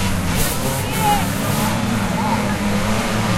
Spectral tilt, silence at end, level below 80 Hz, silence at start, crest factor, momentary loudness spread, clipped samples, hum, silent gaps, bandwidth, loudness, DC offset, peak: -4.5 dB/octave; 0 s; -30 dBFS; 0 s; 14 dB; 2 LU; under 0.1%; none; none; 16 kHz; -19 LUFS; under 0.1%; -4 dBFS